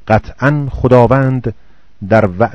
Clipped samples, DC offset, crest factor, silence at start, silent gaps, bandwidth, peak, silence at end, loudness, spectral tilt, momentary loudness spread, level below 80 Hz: 0.9%; 2%; 12 dB; 0.05 s; none; 7.2 kHz; 0 dBFS; 0 s; -12 LUFS; -9 dB/octave; 12 LU; -32 dBFS